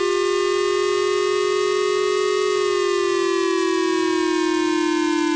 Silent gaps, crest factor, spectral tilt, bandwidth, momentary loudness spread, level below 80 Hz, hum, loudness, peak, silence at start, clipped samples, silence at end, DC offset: none; 4 dB; -2.5 dB/octave; 8 kHz; 0 LU; -58 dBFS; none; -20 LUFS; -16 dBFS; 0 s; under 0.1%; 0 s; under 0.1%